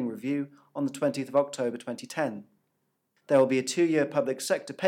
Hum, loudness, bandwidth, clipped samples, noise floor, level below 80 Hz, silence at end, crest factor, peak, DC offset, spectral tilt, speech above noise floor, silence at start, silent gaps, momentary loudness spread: none; -28 LUFS; 16.5 kHz; under 0.1%; -77 dBFS; -88 dBFS; 0 s; 18 dB; -10 dBFS; under 0.1%; -5 dB/octave; 49 dB; 0 s; none; 10 LU